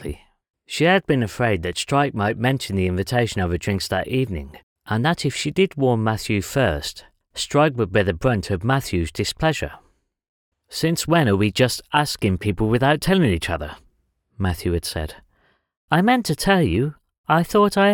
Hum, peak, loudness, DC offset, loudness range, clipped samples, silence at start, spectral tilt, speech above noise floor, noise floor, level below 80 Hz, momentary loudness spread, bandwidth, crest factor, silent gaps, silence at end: none; -2 dBFS; -21 LUFS; under 0.1%; 3 LU; under 0.1%; 0 s; -5.5 dB/octave; 45 dB; -65 dBFS; -42 dBFS; 10 LU; 19.5 kHz; 20 dB; 4.63-4.76 s, 10.29-10.52 s, 15.77-15.88 s, 17.18-17.24 s; 0 s